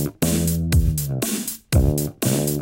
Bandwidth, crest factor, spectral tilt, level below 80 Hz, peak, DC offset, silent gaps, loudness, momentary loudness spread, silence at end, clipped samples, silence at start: 17 kHz; 16 dB; -5.5 dB/octave; -28 dBFS; -6 dBFS; under 0.1%; none; -21 LUFS; 4 LU; 0 s; under 0.1%; 0 s